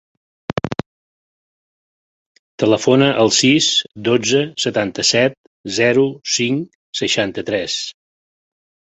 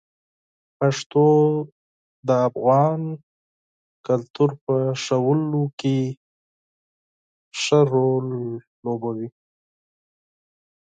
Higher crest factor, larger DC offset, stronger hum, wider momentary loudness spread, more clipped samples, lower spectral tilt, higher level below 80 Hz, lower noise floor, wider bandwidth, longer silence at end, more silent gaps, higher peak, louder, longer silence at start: about the same, 18 dB vs 18 dB; neither; neither; about the same, 13 LU vs 15 LU; neither; second, -3.5 dB/octave vs -6.5 dB/octave; first, -54 dBFS vs -70 dBFS; about the same, under -90 dBFS vs under -90 dBFS; about the same, 8.4 kHz vs 9.2 kHz; second, 1.1 s vs 1.7 s; second, 0.86-2.58 s, 5.37-5.64 s, 6.75-6.93 s vs 1.06-1.10 s, 1.72-2.23 s, 3.23-4.04 s, 4.30-4.34 s, 4.61-4.67 s, 5.73-5.78 s, 6.17-7.52 s, 8.67-8.83 s; first, 0 dBFS vs -6 dBFS; first, -16 LUFS vs -21 LUFS; second, 0.55 s vs 0.8 s